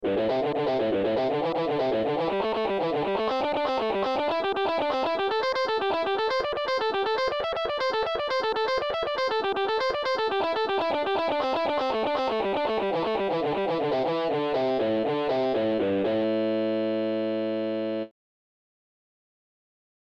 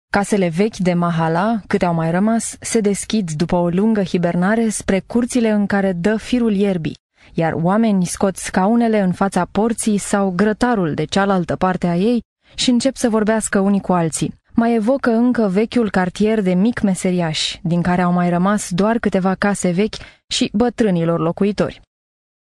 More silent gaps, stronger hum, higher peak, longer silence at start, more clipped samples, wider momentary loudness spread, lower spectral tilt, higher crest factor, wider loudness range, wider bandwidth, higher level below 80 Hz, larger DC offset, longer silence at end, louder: second, none vs 7.00-7.09 s, 12.25-12.36 s, 20.24-20.28 s; neither; second, -14 dBFS vs -2 dBFS; second, 0 s vs 0.15 s; neither; about the same, 2 LU vs 4 LU; about the same, -5.5 dB/octave vs -5.5 dB/octave; about the same, 12 dB vs 16 dB; about the same, 1 LU vs 1 LU; second, 8.4 kHz vs 13 kHz; second, -58 dBFS vs -44 dBFS; neither; first, 1.95 s vs 0.8 s; second, -26 LUFS vs -17 LUFS